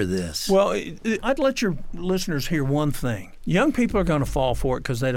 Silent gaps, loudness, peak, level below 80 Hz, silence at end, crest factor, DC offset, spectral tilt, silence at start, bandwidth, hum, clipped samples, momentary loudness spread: none; -23 LUFS; -8 dBFS; -36 dBFS; 0 s; 16 dB; under 0.1%; -5.5 dB/octave; 0 s; 17 kHz; none; under 0.1%; 7 LU